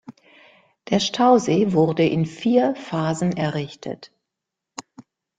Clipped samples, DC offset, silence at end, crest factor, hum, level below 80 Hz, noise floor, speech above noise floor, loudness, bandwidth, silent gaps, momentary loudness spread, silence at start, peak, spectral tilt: under 0.1%; under 0.1%; 0.4 s; 18 dB; none; -60 dBFS; -84 dBFS; 64 dB; -20 LUFS; 9.4 kHz; none; 21 LU; 0.1 s; -4 dBFS; -6 dB/octave